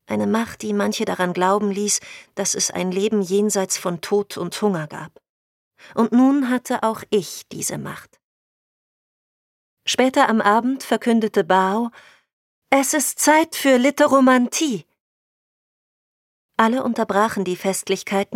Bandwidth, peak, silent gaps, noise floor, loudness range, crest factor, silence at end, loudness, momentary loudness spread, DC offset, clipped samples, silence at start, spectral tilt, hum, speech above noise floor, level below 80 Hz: 16.5 kHz; -2 dBFS; 5.29-5.71 s, 8.24-9.77 s, 12.33-12.62 s, 15.00-16.49 s; under -90 dBFS; 6 LU; 20 dB; 0 s; -19 LUFS; 12 LU; under 0.1%; under 0.1%; 0.1 s; -3.5 dB/octave; none; over 71 dB; -68 dBFS